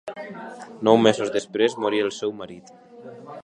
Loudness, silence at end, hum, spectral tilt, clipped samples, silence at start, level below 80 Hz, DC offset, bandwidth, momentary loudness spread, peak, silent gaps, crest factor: -22 LUFS; 0 s; none; -5 dB/octave; under 0.1%; 0.05 s; -68 dBFS; under 0.1%; 10.5 kHz; 22 LU; -2 dBFS; none; 22 dB